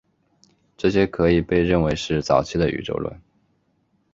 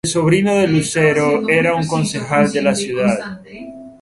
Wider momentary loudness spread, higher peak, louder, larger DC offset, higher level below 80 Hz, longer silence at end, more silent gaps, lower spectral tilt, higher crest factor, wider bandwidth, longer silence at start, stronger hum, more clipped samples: second, 9 LU vs 18 LU; second, -4 dBFS vs 0 dBFS; second, -21 LUFS vs -16 LUFS; neither; first, -40 dBFS vs -50 dBFS; first, 0.95 s vs 0.1 s; neither; first, -6.5 dB/octave vs -5 dB/octave; about the same, 20 dB vs 16 dB; second, 7.8 kHz vs 11.5 kHz; first, 0.8 s vs 0.05 s; neither; neither